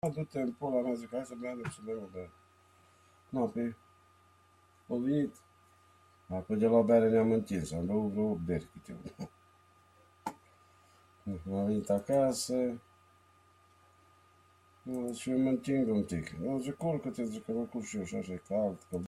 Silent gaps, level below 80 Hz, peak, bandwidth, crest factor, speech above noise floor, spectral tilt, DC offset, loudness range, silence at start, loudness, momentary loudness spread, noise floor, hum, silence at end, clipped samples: none; -66 dBFS; -14 dBFS; 13.5 kHz; 20 dB; 32 dB; -6.5 dB/octave; under 0.1%; 10 LU; 0.05 s; -34 LUFS; 17 LU; -65 dBFS; none; 0 s; under 0.1%